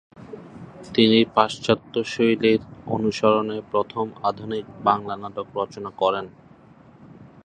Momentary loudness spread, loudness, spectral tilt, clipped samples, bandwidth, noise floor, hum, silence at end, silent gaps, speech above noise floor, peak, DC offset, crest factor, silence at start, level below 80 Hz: 21 LU; -22 LUFS; -5.5 dB/octave; under 0.1%; 9.4 kHz; -50 dBFS; none; 0.2 s; none; 27 dB; 0 dBFS; under 0.1%; 22 dB; 0.2 s; -58 dBFS